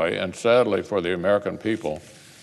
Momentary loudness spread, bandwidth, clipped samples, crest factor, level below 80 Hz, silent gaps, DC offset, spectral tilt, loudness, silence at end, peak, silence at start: 9 LU; 12.5 kHz; under 0.1%; 18 dB; -58 dBFS; none; under 0.1%; -5.5 dB/octave; -23 LUFS; 0.3 s; -6 dBFS; 0 s